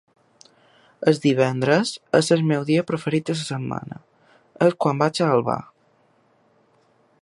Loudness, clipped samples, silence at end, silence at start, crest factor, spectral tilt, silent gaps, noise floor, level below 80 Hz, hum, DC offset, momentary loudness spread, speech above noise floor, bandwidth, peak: -21 LUFS; under 0.1%; 1.6 s; 1 s; 20 dB; -6 dB/octave; none; -61 dBFS; -64 dBFS; none; under 0.1%; 10 LU; 41 dB; 11.5 kHz; -2 dBFS